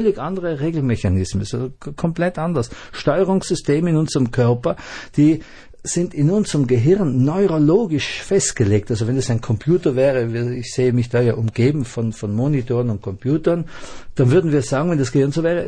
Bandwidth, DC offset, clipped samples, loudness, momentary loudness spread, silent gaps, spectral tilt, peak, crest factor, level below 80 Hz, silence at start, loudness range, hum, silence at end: 10 kHz; under 0.1%; under 0.1%; -19 LUFS; 8 LU; none; -6.5 dB/octave; -4 dBFS; 14 dB; -42 dBFS; 0 s; 3 LU; none; 0 s